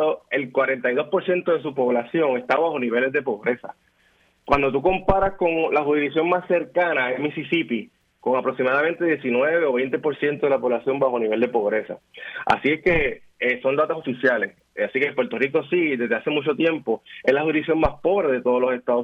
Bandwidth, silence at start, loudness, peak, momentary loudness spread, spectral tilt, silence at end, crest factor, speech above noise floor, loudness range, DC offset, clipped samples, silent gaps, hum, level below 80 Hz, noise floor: 6.6 kHz; 0 s; -22 LUFS; -2 dBFS; 5 LU; -7.5 dB/octave; 0 s; 20 dB; 40 dB; 1 LU; under 0.1%; under 0.1%; none; none; -44 dBFS; -61 dBFS